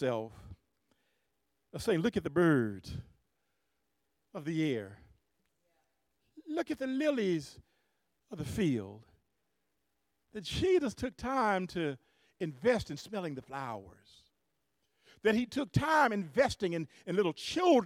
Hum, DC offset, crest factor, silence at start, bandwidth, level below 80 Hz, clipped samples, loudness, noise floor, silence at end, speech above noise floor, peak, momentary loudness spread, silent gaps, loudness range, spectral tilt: none; under 0.1%; 20 dB; 0 s; 15.5 kHz; -60 dBFS; under 0.1%; -33 LUFS; -82 dBFS; 0 s; 50 dB; -14 dBFS; 18 LU; none; 8 LU; -6 dB/octave